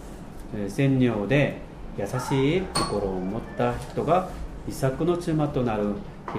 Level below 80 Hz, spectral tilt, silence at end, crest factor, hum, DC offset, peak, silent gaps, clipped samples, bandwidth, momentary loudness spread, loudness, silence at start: -42 dBFS; -6.5 dB/octave; 0 s; 18 dB; none; under 0.1%; -8 dBFS; none; under 0.1%; 15.5 kHz; 13 LU; -26 LUFS; 0 s